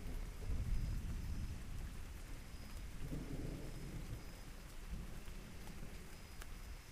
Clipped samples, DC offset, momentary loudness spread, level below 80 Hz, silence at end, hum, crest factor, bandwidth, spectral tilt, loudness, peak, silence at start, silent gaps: under 0.1%; under 0.1%; 10 LU; -48 dBFS; 0 s; none; 18 dB; 15.5 kHz; -5.5 dB/octave; -50 LUFS; -28 dBFS; 0 s; none